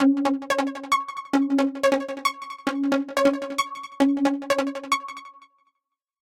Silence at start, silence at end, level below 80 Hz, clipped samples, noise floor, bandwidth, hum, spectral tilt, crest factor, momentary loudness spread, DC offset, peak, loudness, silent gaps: 0 s; 1.05 s; -68 dBFS; under 0.1%; -81 dBFS; 15.5 kHz; none; -3 dB/octave; 20 dB; 6 LU; under 0.1%; -4 dBFS; -24 LUFS; none